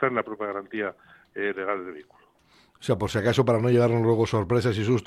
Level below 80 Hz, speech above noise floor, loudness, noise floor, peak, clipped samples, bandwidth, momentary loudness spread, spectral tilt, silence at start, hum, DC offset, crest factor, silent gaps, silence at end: -56 dBFS; 35 dB; -25 LUFS; -60 dBFS; -8 dBFS; under 0.1%; 12.5 kHz; 12 LU; -7 dB/octave; 0 s; none; under 0.1%; 16 dB; none; 0 s